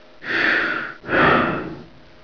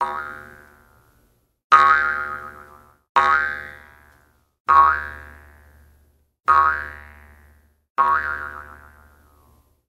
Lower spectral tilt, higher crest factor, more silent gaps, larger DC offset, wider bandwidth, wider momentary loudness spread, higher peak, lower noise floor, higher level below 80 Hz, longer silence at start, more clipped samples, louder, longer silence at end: first, -6 dB/octave vs -3.5 dB/octave; about the same, 18 dB vs 22 dB; second, none vs 1.64-1.70 s, 3.09-3.15 s, 4.60-4.65 s, 7.90-7.95 s; first, 0.4% vs under 0.1%; second, 5.4 kHz vs 15 kHz; second, 15 LU vs 24 LU; second, -4 dBFS vs 0 dBFS; second, -42 dBFS vs -62 dBFS; about the same, -46 dBFS vs -50 dBFS; first, 0.2 s vs 0 s; neither; about the same, -19 LUFS vs -18 LUFS; second, 0.4 s vs 1.15 s